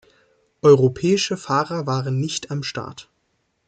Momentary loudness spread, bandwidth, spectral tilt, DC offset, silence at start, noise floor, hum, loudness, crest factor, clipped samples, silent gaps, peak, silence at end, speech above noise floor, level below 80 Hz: 13 LU; 9.2 kHz; -5.5 dB/octave; under 0.1%; 0.65 s; -70 dBFS; none; -20 LUFS; 18 dB; under 0.1%; none; -4 dBFS; 0.65 s; 50 dB; -58 dBFS